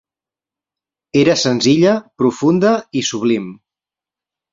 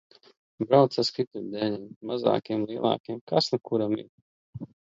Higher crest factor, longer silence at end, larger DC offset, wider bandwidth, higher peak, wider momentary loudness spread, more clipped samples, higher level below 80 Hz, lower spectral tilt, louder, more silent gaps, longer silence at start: about the same, 16 dB vs 20 dB; first, 1 s vs 0.3 s; neither; about the same, 7.8 kHz vs 7.8 kHz; first, -2 dBFS vs -6 dBFS; second, 7 LU vs 15 LU; neither; first, -56 dBFS vs -68 dBFS; second, -5 dB/octave vs -6.5 dB/octave; first, -15 LUFS vs -27 LUFS; second, none vs 1.27-1.31 s, 1.96-2.01 s, 3.00-3.04 s, 3.21-3.27 s, 4.09-4.53 s; first, 1.15 s vs 0.6 s